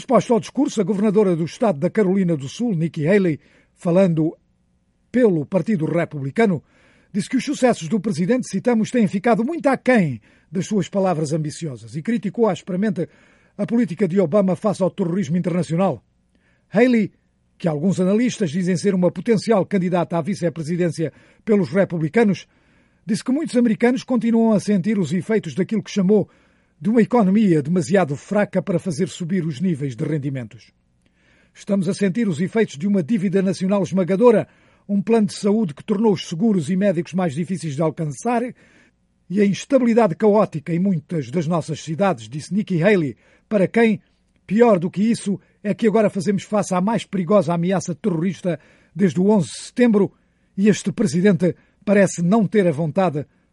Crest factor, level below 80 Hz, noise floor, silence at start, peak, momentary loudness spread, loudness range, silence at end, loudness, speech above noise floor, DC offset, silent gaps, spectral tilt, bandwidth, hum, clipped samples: 18 dB; -62 dBFS; -63 dBFS; 0 s; -2 dBFS; 9 LU; 3 LU; 0.3 s; -20 LUFS; 44 dB; under 0.1%; none; -7 dB/octave; 11.5 kHz; none; under 0.1%